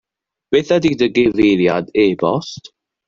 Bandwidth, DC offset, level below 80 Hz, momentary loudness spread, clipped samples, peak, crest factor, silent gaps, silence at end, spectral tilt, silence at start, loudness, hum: 7.4 kHz; under 0.1%; -50 dBFS; 9 LU; under 0.1%; -2 dBFS; 14 dB; none; 0.5 s; -6 dB/octave; 0.5 s; -15 LUFS; none